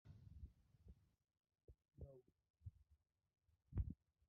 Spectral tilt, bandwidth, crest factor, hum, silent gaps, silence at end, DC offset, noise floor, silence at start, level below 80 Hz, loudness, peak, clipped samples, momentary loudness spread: -11 dB/octave; 2.9 kHz; 24 dB; none; 1.64-1.68 s, 2.50-2.54 s; 0.35 s; under 0.1%; -81 dBFS; 0.05 s; -60 dBFS; -57 LUFS; -34 dBFS; under 0.1%; 14 LU